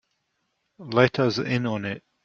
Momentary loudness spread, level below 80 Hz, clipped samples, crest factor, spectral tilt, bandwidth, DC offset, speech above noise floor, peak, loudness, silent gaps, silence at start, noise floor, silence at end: 10 LU; -62 dBFS; under 0.1%; 22 dB; -6.5 dB/octave; 7.4 kHz; under 0.1%; 52 dB; -2 dBFS; -24 LUFS; none; 0.8 s; -75 dBFS; 0.25 s